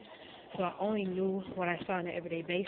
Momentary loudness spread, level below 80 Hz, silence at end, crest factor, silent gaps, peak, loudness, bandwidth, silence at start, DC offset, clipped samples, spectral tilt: 11 LU; -70 dBFS; 0 s; 18 dB; none; -18 dBFS; -35 LUFS; 4.4 kHz; 0 s; under 0.1%; under 0.1%; -4.5 dB/octave